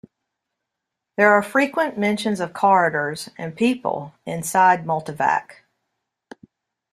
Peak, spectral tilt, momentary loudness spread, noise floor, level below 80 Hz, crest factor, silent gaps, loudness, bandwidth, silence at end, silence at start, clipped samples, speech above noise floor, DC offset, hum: -2 dBFS; -5 dB/octave; 13 LU; -82 dBFS; -66 dBFS; 20 dB; none; -20 LUFS; 14.5 kHz; 1.4 s; 1.2 s; under 0.1%; 62 dB; under 0.1%; none